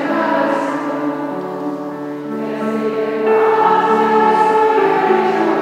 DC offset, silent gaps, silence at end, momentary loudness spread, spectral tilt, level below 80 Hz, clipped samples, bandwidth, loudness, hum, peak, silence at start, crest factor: under 0.1%; none; 0 s; 11 LU; -6 dB/octave; -76 dBFS; under 0.1%; 12.5 kHz; -16 LUFS; none; -2 dBFS; 0 s; 14 dB